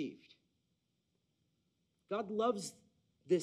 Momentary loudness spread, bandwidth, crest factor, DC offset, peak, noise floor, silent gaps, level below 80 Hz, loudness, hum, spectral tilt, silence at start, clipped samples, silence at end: 12 LU; 13 kHz; 20 dB; under 0.1%; -20 dBFS; -82 dBFS; none; -86 dBFS; -39 LUFS; none; -5.5 dB/octave; 0 s; under 0.1%; 0 s